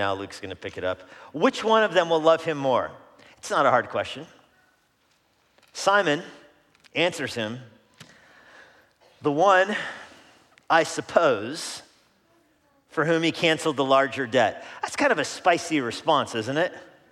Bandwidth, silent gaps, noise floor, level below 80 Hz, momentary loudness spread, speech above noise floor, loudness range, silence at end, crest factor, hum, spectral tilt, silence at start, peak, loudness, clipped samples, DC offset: 14 kHz; none; -66 dBFS; -72 dBFS; 15 LU; 42 dB; 5 LU; 0.25 s; 22 dB; none; -4 dB/octave; 0 s; -4 dBFS; -24 LUFS; under 0.1%; under 0.1%